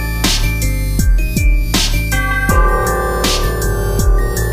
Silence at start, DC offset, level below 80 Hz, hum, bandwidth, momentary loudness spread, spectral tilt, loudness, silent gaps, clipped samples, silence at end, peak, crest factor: 0 s; 0.6%; -16 dBFS; none; 16 kHz; 4 LU; -4 dB/octave; -15 LUFS; none; under 0.1%; 0 s; 0 dBFS; 14 dB